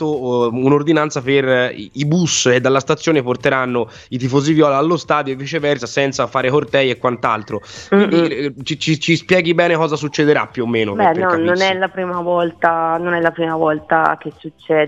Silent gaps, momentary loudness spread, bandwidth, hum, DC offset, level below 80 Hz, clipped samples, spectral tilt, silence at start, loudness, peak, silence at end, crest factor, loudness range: none; 8 LU; 8.2 kHz; none; under 0.1%; -56 dBFS; under 0.1%; -5 dB/octave; 0 s; -16 LUFS; 0 dBFS; 0 s; 16 dB; 2 LU